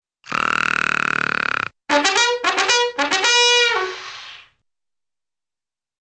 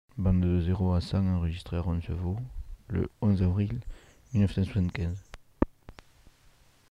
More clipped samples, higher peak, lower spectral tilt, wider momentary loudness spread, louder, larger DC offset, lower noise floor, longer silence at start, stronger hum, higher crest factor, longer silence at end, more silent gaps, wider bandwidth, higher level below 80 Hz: neither; first, -2 dBFS vs -8 dBFS; second, -0.5 dB/octave vs -9 dB/octave; first, 14 LU vs 10 LU; first, -17 LUFS vs -30 LUFS; neither; first, under -90 dBFS vs -60 dBFS; about the same, 0.25 s vs 0.15 s; neither; about the same, 18 dB vs 22 dB; first, 1.6 s vs 1 s; neither; about the same, 9.8 kHz vs 9.8 kHz; second, -58 dBFS vs -42 dBFS